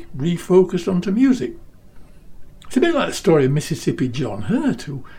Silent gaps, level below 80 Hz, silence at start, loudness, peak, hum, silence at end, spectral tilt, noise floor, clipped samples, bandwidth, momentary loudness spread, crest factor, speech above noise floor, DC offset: none; -44 dBFS; 0 s; -19 LUFS; -2 dBFS; none; 0 s; -6.5 dB/octave; -40 dBFS; under 0.1%; 16 kHz; 8 LU; 16 dB; 21 dB; under 0.1%